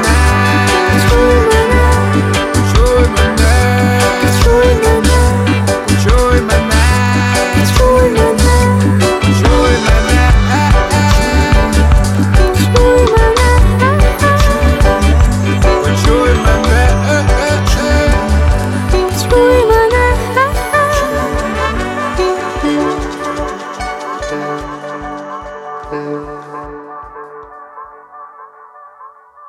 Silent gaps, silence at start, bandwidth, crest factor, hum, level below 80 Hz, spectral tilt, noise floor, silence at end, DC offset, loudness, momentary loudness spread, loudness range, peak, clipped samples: none; 0 s; 15.5 kHz; 10 dB; none; -14 dBFS; -5.5 dB/octave; -38 dBFS; 0.4 s; under 0.1%; -11 LUFS; 13 LU; 12 LU; 0 dBFS; under 0.1%